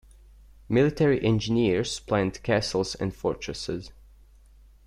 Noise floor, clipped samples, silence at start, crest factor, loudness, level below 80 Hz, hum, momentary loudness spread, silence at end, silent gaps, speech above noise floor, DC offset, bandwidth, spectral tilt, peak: -53 dBFS; under 0.1%; 0.7 s; 18 dB; -26 LUFS; -48 dBFS; none; 10 LU; 0.95 s; none; 28 dB; under 0.1%; 12.5 kHz; -6 dB/octave; -8 dBFS